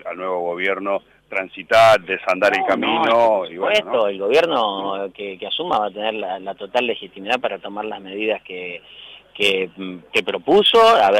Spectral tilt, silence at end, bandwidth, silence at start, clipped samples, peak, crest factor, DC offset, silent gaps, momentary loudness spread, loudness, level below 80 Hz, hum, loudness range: -3.5 dB/octave; 0 s; 16.5 kHz; 0.05 s; under 0.1%; -6 dBFS; 14 dB; under 0.1%; none; 15 LU; -19 LUFS; -58 dBFS; none; 7 LU